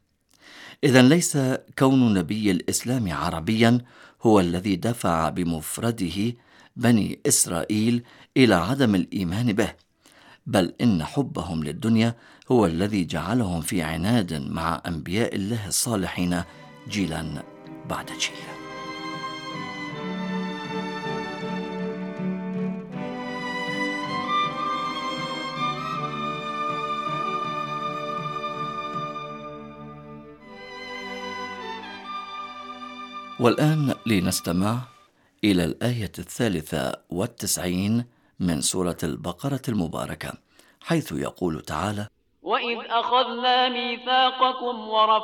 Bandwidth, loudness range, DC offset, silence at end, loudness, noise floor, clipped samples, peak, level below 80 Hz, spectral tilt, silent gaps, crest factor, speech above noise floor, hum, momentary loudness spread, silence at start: 18.5 kHz; 9 LU; under 0.1%; 0 s; -25 LUFS; -58 dBFS; under 0.1%; -2 dBFS; -52 dBFS; -4.5 dB/octave; none; 24 dB; 35 dB; none; 15 LU; 0.45 s